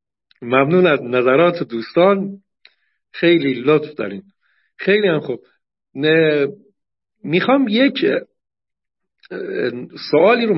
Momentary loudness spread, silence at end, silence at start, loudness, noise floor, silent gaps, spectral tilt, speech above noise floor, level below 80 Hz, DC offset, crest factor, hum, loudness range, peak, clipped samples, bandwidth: 16 LU; 0 s; 0.4 s; -17 LUFS; -76 dBFS; none; -10.5 dB/octave; 60 dB; -68 dBFS; under 0.1%; 16 dB; none; 3 LU; -2 dBFS; under 0.1%; 5.8 kHz